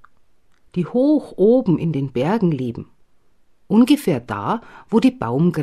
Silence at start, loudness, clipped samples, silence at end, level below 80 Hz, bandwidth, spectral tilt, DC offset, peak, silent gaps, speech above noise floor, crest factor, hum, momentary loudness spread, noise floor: 0.75 s; -19 LUFS; under 0.1%; 0 s; -54 dBFS; 15 kHz; -8 dB/octave; 0.2%; -4 dBFS; none; 42 dB; 16 dB; none; 11 LU; -60 dBFS